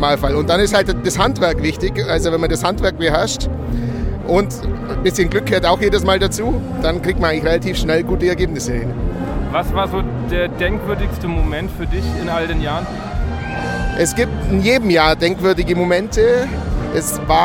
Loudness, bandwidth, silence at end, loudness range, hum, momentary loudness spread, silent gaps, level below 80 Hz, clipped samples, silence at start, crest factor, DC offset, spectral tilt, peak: -17 LUFS; 17.5 kHz; 0 s; 5 LU; none; 8 LU; none; -24 dBFS; under 0.1%; 0 s; 16 dB; under 0.1%; -5 dB/octave; 0 dBFS